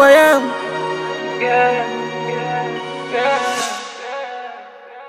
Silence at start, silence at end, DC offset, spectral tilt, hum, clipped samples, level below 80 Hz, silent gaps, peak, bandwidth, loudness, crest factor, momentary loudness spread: 0 s; 0 s; under 0.1%; -3.5 dB/octave; none; under 0.1%; -66 dBFS; none; 0 dBFS; 16.5 kHz; -18 LUFS; 18 dB; 14 LU